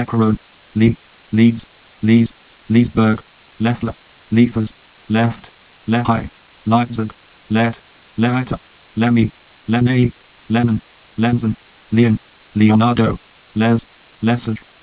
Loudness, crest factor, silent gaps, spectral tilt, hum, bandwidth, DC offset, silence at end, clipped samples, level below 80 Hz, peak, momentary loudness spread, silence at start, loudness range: -17 LUFS; 16 dB; none; -11.5 dB/octave; none; 4 kHz; under 0.1%; 0.25 s; under 0.1%; -42 dBFS; 0 dBFS; 13 LU; 0 s; 3 LU